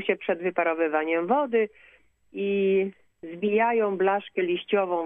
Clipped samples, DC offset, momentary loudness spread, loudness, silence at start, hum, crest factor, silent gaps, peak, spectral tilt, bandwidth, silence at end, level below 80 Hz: under 0.1%; under 0.1%; 9 LU; -25 LUFS; 0 s; none; 16 dB; none; -10 dBFS; -9 dB/octave; 3.8 kHz; 0 s; -76 dBFS